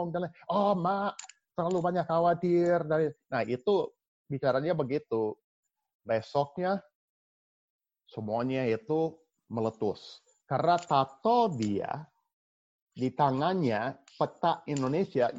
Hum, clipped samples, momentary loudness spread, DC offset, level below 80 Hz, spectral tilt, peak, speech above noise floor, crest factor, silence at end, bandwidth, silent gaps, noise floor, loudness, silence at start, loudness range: none; under 0.1%; 11 LU; under 0.1%; -70 dBFS; -7 dB/octave; -12 dBFS; over 61 dB; 18 dB; 0 s; 8 kHz; 4.08-4.25 s, 5.44-5.63 s, 5.95-6.00 s, 6.95-7.79 s, 12.33-12.87 s; under -90 dBFS; -30 LUFS; 0 s; 5 LU